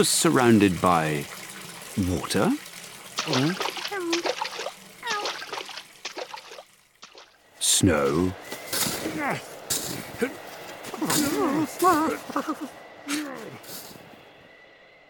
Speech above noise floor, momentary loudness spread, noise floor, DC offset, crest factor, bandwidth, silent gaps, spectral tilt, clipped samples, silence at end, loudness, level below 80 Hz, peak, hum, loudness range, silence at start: 28 dB; 19 LU; -52 dBFS; under 0.1%; 20 dB; 19 kHz; none; -3.5 dB/octave; under 0.1%; 0.8 s; -25 LUFS; -56 dBFS; -6 dBFS; none; 6 LU; 0 s